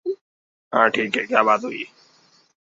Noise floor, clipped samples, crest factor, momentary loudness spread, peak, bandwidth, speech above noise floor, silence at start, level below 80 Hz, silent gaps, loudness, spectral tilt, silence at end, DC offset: -57 dBFS; under 0.1%; 22 dB; 16 LU; -2 dBFS; 7.8 kHz; 37 dB; 0.05 s; -72 dBFS; 0.21-0.71 s; -20 LUFS; -4.5 dB/octave; 0.85 s; under 0.1%